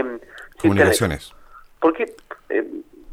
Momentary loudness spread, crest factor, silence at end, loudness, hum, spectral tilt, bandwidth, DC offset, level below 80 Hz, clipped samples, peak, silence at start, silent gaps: 23 LU; 20 dB; 0 s; -20 LUFS; none; -5 dB/octave; 16 kHz; under 0.1%; -46 dBFS; under 0.1%; -2 dBFS; 0 s; none